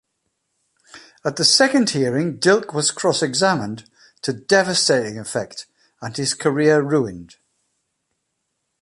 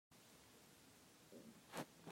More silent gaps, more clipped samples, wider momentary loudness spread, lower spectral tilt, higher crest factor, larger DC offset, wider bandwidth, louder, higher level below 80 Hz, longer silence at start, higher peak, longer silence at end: neither; neither; first, 16 LU vs 12 LU; about the same, -3.5 dB/octave vs -4 dB/octave; second, 20 dB vs 30 dB; neither; second, 11.5 kHz vs 16 kHz; first, -18 LUFS vs -59 LUFS; first, -62 dBFS vs -86 dBFS; first, 0.95 s vs 0.1 s; first, 0 dBFS vs -30 dBFS; first, 1.6 s vs 0 s